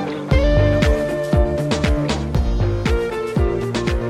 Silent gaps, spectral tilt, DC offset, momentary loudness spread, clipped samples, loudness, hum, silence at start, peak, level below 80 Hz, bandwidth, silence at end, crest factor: none; -6.5 dB/octave; under 0.1%; 5 LU; under 0.1%; -19 LUFS; none; 0 s; -2 dBFS; -22 dBFS; 13 kHz; 0 s; 14 dB